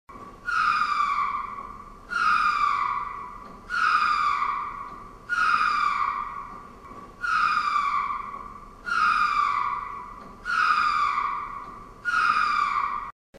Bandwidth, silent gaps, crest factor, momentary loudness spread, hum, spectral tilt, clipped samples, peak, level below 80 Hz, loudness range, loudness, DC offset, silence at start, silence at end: 12 kHz; 13.12-13.33 s; 16 dB; 19 LU; none; -2 dB/octave; under 0.1%; -10 dBFS; -52 dBFS; 2 LU; -24 LUFS; under 0.1%; 0.1 s; 0 s